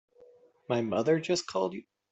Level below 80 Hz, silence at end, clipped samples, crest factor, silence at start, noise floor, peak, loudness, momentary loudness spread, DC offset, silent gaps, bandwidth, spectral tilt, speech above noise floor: -72 dBFS; 0.3 s; under 0.1%; 18 dB; 0.7 s; -59 dBFS; -14 dBFS; -30 LUFS; 7 LU; under 0.1%; none; 8.2 kHz; -5 dB/octave; 30 dB